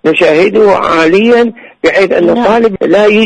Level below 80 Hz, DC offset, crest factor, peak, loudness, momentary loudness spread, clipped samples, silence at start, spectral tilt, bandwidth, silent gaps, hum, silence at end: -44 dBFS; under 0.1%; 8 dB; 0 dBFS; -8 LUFS; 3 LU; under 0.1%; 0.05 s; -5.5 dB/octave; 9.8 kHz; none; none; 0 s